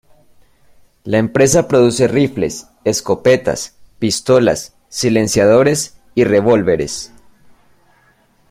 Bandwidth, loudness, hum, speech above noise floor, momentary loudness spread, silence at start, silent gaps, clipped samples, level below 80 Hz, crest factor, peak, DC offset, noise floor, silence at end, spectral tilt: 16 kHz; -14 LUFS; none; 41 dB; 12 LU; 1.05 s; none; under 0.1%; -44 dBFS; 14 dB; -2 dBFS; under 0.1%; -54 dBFS; 1.45 s; -5 dB/octave